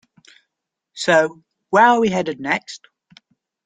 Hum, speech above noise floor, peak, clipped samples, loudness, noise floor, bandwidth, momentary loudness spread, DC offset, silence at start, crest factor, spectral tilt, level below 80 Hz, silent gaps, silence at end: none; 63 dB; -2 dBFS; under 0.1%; -17 LUFS; -80 dBFS; 9.4 kHz; 12 LU; under 0.1%; 0.95 s; 18 dB; -4.5 dB/octave; -62 dBFS; none; 0.9 s